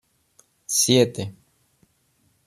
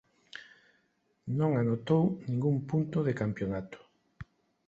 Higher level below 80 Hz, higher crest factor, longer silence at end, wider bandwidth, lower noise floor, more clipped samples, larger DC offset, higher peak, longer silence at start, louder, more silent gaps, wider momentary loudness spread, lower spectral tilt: about the same, -64 dBFS vs -62 dBFS; about the same, 22 dB vs 18 dB; first, 1.15 s vs 0.45 s; first, 14.5 kHz vs 7.6 kHz; second, -66 dBFS vs -74 dBFS; neither; neither; first, -4 dBFS vs -14 dBFS; first, 0.7 s vs 0.35 s; first, -20 LUFS vs -31 LUFS; neither; second, 19 LU vs 23 LU; second, -3.5 dB/octave vs -9.5 dB/octave